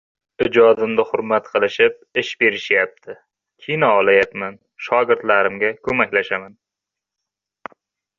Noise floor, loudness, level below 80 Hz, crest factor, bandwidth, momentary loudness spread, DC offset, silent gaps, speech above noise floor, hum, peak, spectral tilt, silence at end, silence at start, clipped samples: -85 dBFS; -17 LUFS; -58 dBFS; 18 dB; 7.2 kHz; 20 LU; under 0.1%; none; 67 dB; none; -2 dBFS; -5.5 dB/octave; 1.7 s; 0.4 s; under 0.1%